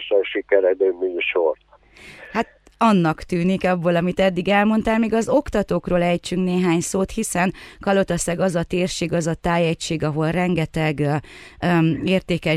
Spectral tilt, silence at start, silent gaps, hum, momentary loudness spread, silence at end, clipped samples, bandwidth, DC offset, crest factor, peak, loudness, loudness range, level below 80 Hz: -5.5 dB/octave; 0 s; none; none; 5 LU; 0 s; under 0.1%; 14 kHz; under 0.1%; 16 dB; -4 dBFS; -20 LUFS; 2 LU; -44 dBFS